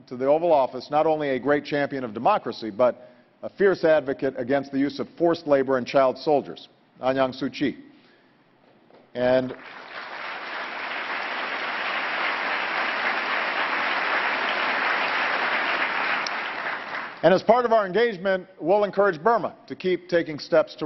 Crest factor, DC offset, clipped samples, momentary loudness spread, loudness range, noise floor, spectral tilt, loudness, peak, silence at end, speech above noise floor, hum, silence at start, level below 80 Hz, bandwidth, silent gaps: 22 dB; under 0.1%; under 0.1%; 11 LU; 6 LU; -59 dBFS; -6 dB/octave; -24 LUFS; -4 dBFS; 0 s; 36 dB; none; 0.1 s; -66 dBFS; 6.2 kHz; none